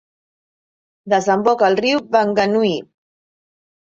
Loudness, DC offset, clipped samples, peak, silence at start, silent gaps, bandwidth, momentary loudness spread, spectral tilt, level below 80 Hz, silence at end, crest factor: -17 LUFS; under 0.1%; under 0.1%; -2 dBFS; 1.05 s; none; 7.8 kHz; 5 LU; -5 dB/octave; -60 dBFS; 1.1 s; 18 dB